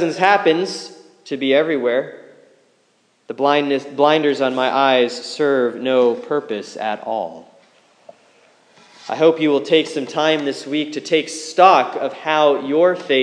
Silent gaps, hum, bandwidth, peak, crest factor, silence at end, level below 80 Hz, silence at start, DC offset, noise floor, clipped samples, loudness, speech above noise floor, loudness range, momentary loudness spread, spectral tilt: none; none; 10.5 kHz; 0 dBFS; 18 dB; 0 s; -80 dBFS; 0 s; under 0.1%; -60 dBFS; under 0.1%; -17 LUFS; 43 dB; 6 LU; 11 LU; -4 dB/octave